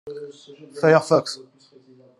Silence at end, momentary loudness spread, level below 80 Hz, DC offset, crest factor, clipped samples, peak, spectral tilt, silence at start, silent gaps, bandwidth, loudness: 0.8 s; 23 LU; -70 dBFS; under 0.1%; 22 dB; under 0.1%; -2 dBFS; -5.5 dB/octave; 0.05 s; none; 12 kHz; -19 LUFS